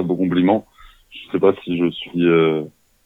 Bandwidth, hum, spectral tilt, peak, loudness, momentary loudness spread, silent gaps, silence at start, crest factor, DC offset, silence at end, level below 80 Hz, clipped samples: 4 kHz; none; -8.5 dB/octave; -2 dBFS; -18 LUFS; 11 LU; none; 0 s; 16 dB; under 0.1%; 0.35 s; -56 dBFS; under 0.1%